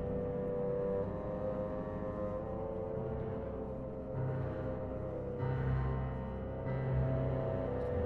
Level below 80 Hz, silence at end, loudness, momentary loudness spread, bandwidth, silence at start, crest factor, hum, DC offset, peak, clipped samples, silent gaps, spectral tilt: -46 dBFS; 0 s; -38 LUFS; 6 LU; 4.3 kHz; 0 s; 12 dB; none; under 0.1%; -24 dBFS; under 0.1%; none; -11 dB/octave